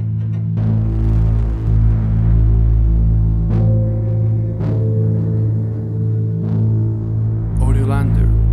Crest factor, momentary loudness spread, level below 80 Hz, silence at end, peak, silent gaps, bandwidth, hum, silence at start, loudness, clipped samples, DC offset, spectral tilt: 10 dB; 4 LU; -20 dBFS; 0 s; -4 dBFS; none; 2.7 kHz; none; 0 s; -17 LUFS; under 0.1%; under 0.1%; -10.5 dB/octave